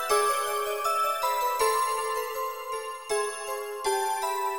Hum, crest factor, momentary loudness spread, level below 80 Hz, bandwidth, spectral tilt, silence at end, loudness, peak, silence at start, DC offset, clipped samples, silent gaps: none; 16 dB; 9 LU; -64 dBFS; 18 kHz; 0.5 dB/octave; 0 s; -28 LUFS; -12 dBFS; 0 s; 0.2%; under 0.1%; none